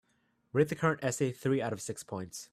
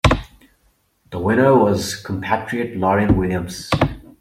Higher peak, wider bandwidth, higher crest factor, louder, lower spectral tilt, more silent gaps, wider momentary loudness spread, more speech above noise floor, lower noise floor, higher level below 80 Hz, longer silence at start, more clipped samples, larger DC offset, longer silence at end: second, -14 dBFS vs -2 dBFS; about the same, 15 kHz vs 16 kHz; about the same, 20 dB vs 18 dB; second, -33 LUFS vs -19 LUFS; about the same, -5.5 dB/octave vs -6 dB/octave; neither; about the same, 11 LU vs 11 LU; about the same, 42 dB vs 44 dB; first, -74 dBFS vs -61 dBFS; second, -68 dBFS vs -34 dBFS; first, 0.55 s vs 0.05 s; neither; neither; about the same, 0.1 s vs 0.2 s